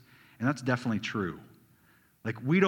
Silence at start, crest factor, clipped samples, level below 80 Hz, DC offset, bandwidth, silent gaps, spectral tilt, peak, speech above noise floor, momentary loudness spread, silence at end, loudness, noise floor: 0.4 s; 22 dB; under 0.1%; -68 dBFS; under 0.1%; 16.5 kHz; none; -6.5 dB/octave; -10 dBFS; 35 dB; 10 LU; 0 s; -32 LUFS; -64 dBFS